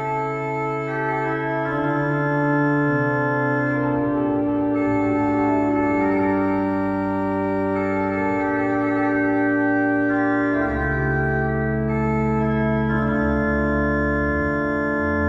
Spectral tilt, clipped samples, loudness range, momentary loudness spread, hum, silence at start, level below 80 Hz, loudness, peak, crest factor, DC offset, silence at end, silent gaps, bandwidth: -9.5 dB/octave; under 0.1%; 1 LU; 3 LU; none; 0 s; -38 dBFS; -21 LUFS; -8 dBFS; 12 dB; under 0.1%; 0 s; none; 7.4 kHz